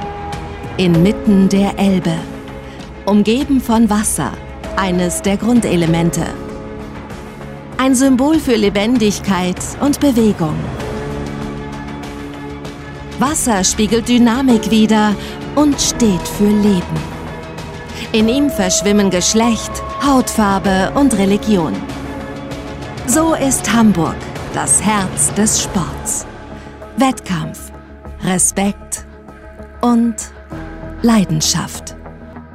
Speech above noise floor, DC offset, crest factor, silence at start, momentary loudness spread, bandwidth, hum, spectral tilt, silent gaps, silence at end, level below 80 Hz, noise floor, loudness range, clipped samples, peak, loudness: 22 dB; under 0.1%; 14 dB; 0 s; 17 LU; 16 kHz; none; -4.5 dB/octave; none; 0 s; -34 dBFS; -35 dBFS; 5 LU; under 0.1%; -2 dBFS; -14 LUFS